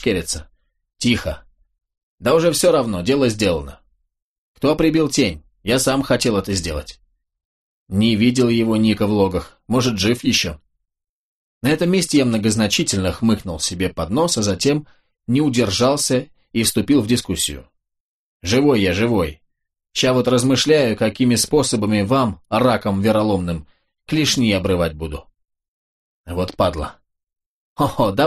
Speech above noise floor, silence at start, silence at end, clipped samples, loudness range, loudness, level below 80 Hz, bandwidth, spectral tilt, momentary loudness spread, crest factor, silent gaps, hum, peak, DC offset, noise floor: 52 dB; 0 s; 0 s; under 0.1%; 3 LU; -18 LUFS; -42 dBFS; 13 kHz; -4.5 dB/octave; 11 LU; 16 dB; 2.03-2.18 s, 4.22-4.55 s, 7.45-7.86 s, 11.09-11.61 s, 18.00-18.40 s, 25.68-26.24 s, 27.46-27.76 s; none; -4 dBFS; under 0.1%; -69 dBFS